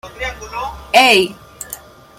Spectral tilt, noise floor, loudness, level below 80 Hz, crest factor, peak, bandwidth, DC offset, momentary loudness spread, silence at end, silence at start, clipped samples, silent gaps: -2.5 dB/octave; -36 dBFS; -13 LUFS; -40 dBFS; 18 dB; 0 dBFS; 16.5 kHz; under 0.1%; 21 LU; 0.4 s; 0.05 s; under 0.1%; none